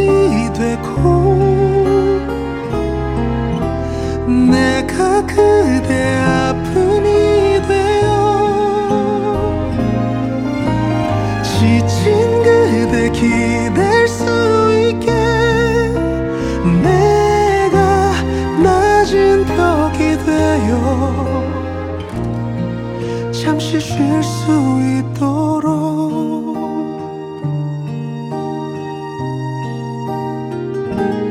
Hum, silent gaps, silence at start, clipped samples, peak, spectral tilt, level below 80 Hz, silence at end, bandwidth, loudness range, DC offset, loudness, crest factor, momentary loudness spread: none; none; 0 s; under 0.1%; 0 dBFS; -6.5 dB/octave; -30 dBFS; 0 s; 14 kHz; 7 LU; under 0.1%; -15 LUFS; 14 dB; 11 LU